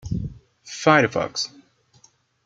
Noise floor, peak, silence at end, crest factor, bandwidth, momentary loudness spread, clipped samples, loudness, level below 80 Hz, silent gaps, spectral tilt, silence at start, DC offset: -58 dBFS; -2 dBFS; 1 s; 22 dB; 9.2 kHz; 17 LU; under 0.1%; -21 LUFS; -46 dBFS; none; -4.5 dB/octave; 0.05 s; under 0.1%